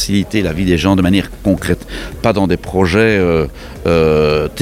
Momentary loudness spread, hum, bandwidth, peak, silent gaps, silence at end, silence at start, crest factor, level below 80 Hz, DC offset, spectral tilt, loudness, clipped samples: 8 LU; none; 16 kHz; 0 dBFS; none; 0 s; 0 s; 14 dB; -30 dBFS; under 0.1%; -6 dB/octave; -14 LUFS; under 0.1%